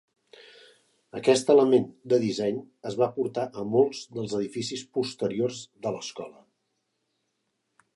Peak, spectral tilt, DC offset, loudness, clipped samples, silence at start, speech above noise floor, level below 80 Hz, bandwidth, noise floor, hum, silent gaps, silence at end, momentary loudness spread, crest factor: -8 dBFS; -5 dB/octave; under 0.1%; -26 LUFS; under 0.1%; 1.15 s; 52 dB; -72 dBFS; 11.5 kHz; -78 dBFS; none; none; 1.65 s; 16 LU; 20 dB